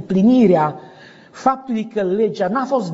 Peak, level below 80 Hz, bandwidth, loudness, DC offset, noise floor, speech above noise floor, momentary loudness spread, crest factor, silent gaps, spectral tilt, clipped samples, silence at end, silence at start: -4 dBFS; -58 dBFS; 7.8 kHz; -17 LUFS; under 0.1%; -43 dBFS; 26 dB; 10 LU; 14 dB; none; -7 dB/octave; under 0.1%; 0 s; 0 s